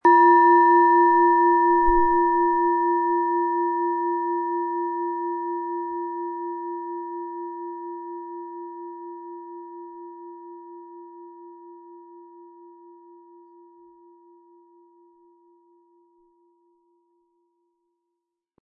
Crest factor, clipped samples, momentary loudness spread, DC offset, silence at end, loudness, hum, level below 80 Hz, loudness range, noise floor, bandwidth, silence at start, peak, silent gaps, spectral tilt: 18 dB; under 0.1%; 26 LU; under 0.1%; 6.15 s; -21 LUFS; none; -50 dBFS; 25 LU; -82 dBFS; 4.1 kHz; 0.05 s; -6 dBFS; none; -8.5 dB/octave